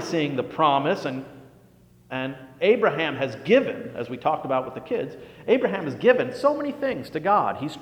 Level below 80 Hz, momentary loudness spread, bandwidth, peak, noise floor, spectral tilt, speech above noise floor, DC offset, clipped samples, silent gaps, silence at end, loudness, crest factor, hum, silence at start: -64 dBFS; 12 LU; 14 kHz; -6 dBFS; -54 dBFS; -6 dB/octave; 31 dB; under 0.1%; under 0.1%; none; 0 s; -24 LUFS; 18 dB; none; 0 s